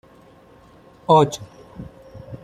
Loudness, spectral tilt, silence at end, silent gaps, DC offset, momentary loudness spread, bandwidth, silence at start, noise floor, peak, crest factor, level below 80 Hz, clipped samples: -17 LUFS; -6 dB/octave; 0.1 s; none; under 0.1%; 25 LU; 14.5 kHz; 1.1 s; -49 dBFS; -2 dBFS; 22 dB; -54 dBFS; under 0.1%